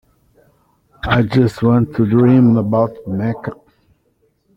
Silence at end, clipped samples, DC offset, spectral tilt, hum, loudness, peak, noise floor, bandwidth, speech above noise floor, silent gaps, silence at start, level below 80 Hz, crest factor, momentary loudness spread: 1.05 s; under 0.1%; under 0.1%; -9 dB/octave; none; -15 LUFS; -2 dBFS; -61 dBFS; 8 kHz; 48 dB; none; 1.05 s; -42 dBFS; 14 dB; 13 LU